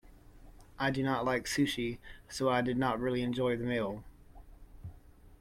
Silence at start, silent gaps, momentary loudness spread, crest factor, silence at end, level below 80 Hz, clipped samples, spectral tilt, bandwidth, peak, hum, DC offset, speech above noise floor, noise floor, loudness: 0.05 s; none; 18 LU; 18 dB; 0.05 s; -56 dBFS; under 0.1%; -5 dB/octave; 16.5 kHz; -16 dBFS; none; under 0.1%; 23 dB; -56 dBFS; -33 LUFS